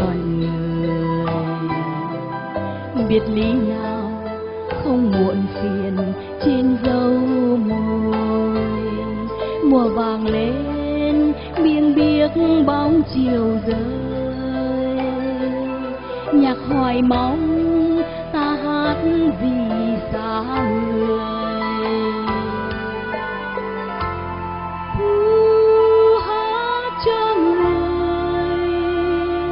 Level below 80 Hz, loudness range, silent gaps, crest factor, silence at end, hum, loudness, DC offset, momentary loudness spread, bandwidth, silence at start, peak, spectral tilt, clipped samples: -40 dBFS; 5 LU; none; 16 dB; 0 s; none; -19 LUFS; under 0.1%; 10 LU; 5.4 kHz; 0 s; -4 dBFS; -6 dB/octave; under 0.1%